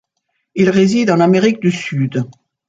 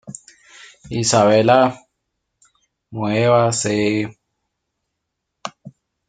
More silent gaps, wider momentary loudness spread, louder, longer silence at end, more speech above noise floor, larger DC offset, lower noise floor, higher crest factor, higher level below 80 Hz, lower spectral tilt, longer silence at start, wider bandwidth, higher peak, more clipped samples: neither; second, 11 LU vs 21 LU; first, -14 LUFS vs -17 LUFS; about the same, 0.4 s vs 0.4 s; second, 57 dB vs 62 dB; neither; second, -70 dBFS vs -78 dBFS; second, 14 dB vs 20 dB; about the same, -56 dBFS vs -58 dBFS; first, -6.5 dB/octave vs -4.5 dB/octave; first, 0.55 s vs 0.05 s; second, 7.8 kHz vs 9.6 kHz; about the same, 0 dBFS vs 0 dBFS; neither